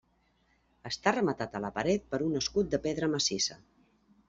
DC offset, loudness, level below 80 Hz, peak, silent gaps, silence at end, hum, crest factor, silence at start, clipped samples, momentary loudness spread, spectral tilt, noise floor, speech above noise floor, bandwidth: under 0.1%; -31 LUFS; -58 dBFS; -12 dBFS; none; 0.75 s; none; 22 dB; 0.85 s; under 0.1%; 7 LU; -3.5 dB/octave; -71 dBFS; 40 dB; 8 kHz